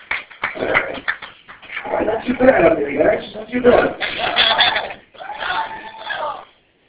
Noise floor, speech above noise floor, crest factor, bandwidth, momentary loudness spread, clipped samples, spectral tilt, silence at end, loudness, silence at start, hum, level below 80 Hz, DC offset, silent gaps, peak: -44 dBFS; 27 dB; 18 dB; 4 kHz; 18 LU; under 0.1%; -7.5 dB/octave; 0.45 s; -17 LUFS; 0 s; none; -46 dBFS; under 0.1%; none; 0 dBFS